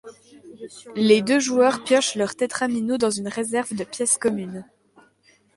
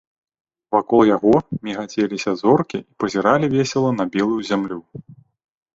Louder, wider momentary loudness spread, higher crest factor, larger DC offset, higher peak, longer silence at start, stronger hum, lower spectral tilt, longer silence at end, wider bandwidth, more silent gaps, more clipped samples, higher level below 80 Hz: about the same, -21 LUFS vs -19 LUFS; first, 17 LU vs 11 LU; about the same, 18 dB vs 18 dB; neither; about the same, -4 dBFS vs -2 dBFS; second, 0.05 s vs 0.7 s; neither; second, -3.5 dB/octave vs -6.5 dB/octave; first, 0.95 s vs 0.6 s; first, 11.5 kHz vs 7.8 kHz; neither; neither; second, -66 dBFS vs -56 dBFS